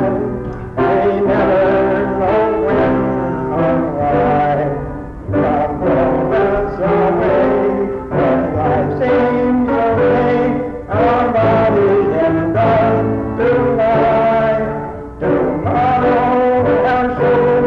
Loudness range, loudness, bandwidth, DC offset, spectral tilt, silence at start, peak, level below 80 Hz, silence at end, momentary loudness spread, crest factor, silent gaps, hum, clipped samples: 2 LU; -14 LUFS; 6.4 kHz; under 0.1%; -9.5 dB/octave; 0 s; -6 dBFS; -34 dBFS; 0 s; 6 LU; 8 dB; none; none; under 0.1%